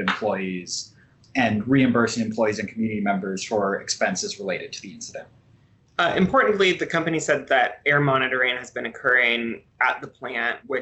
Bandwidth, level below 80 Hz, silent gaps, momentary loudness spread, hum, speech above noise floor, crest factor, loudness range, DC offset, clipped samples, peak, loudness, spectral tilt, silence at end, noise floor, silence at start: 8.4 kHz; -58 dBFS; none; 13 LU; none; 34 dB; 16 dB; 5 LU; under 0.1%; under 0.1%; -8 dBFS; -22 LUFS; -4.5 dB/octave; 0 s; -57 dBFS; 0 s